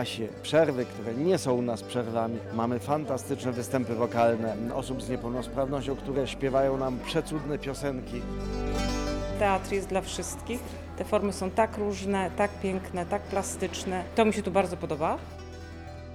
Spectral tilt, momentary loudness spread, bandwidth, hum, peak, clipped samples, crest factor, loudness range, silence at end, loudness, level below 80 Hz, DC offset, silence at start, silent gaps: -5.5 dB/octave; 9 LU; 18 kHz; none; -10 dBFS; under 0.1%; 20 dB; 2 LU; 0 s; -29 LUFS; -44 dBFS; under 0.1%; 0 s; none